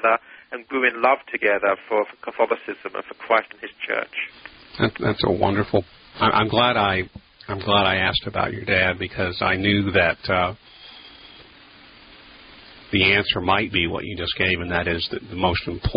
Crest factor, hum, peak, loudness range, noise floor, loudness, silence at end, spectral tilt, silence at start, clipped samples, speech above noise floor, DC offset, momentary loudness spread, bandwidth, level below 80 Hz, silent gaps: 20 dB; none; -2 dBFS; 4 LU; -48 dBFS; -21 LUFS; 0 s; -10 dB/octave; 0 s; under 0.1%; 26 dB; under 0.1%; 15 LU; 5.4 kHz; -42 dBFS; none